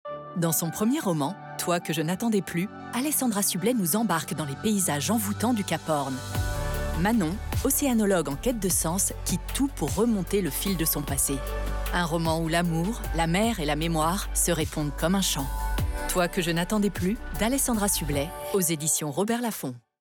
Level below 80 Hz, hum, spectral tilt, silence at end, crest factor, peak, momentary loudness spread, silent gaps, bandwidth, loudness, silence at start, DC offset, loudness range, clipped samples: -38 dBFS; none; -4 dB/octave; 0.25 s; 12 dB; -14 dBFS; 6 LU; none; over 20 kHz; -26 LUFS; 0.05 s; under 0.1%; 1 LU; under 0.1%